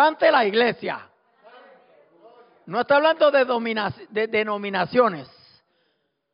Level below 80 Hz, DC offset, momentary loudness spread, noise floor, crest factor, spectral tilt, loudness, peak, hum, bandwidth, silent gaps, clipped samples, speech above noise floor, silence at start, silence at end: -68 dBFS; under 0.1%; 12 LU; -72 dBFS; 16 dB; -2 dB/octave; -21 LUFS; -6 dBFS; none; 5.4 kHz; none; under 0.1%; 51 dB; 0 s; 1.1 s